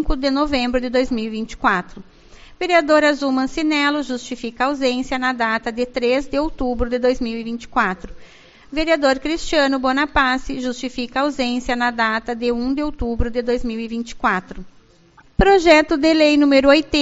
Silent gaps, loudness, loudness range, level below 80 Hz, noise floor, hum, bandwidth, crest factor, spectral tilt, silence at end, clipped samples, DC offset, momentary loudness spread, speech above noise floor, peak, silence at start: none; -19 LUFS; 4 LU; -34 dBFS; -50 dBFS; none; 8 kHz; 18 dB; -2.5 dB/octave; 0 s; under 0.1%; under 0.1%; 12 LU; 32 dB; 0 dBFS; 0 s